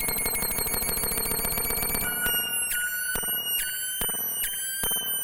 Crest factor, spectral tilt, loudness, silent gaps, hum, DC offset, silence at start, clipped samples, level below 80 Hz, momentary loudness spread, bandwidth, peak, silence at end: 22 dB; -0.5 dB/octave; -25 LUFS; none; none; under 0.1%; 0 s; under 0.1%; -42 dBFS; 2 LU; 17.5 kHz; -6 dBFS; 0 s